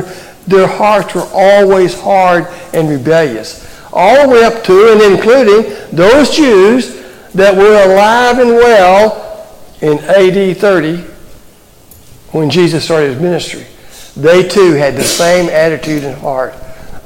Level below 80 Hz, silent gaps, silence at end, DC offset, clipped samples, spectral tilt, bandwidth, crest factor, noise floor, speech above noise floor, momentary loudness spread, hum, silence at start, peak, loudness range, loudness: -38 dBFS; none; 0.05 s; under 0.1%; under 0.1%; -5 dB/octave; 17 kHz; 8 dB; -40 dBFS; 32 dB; 13 LU; none; 0 s; 0 dBFS; 6 LU; -8 LUFS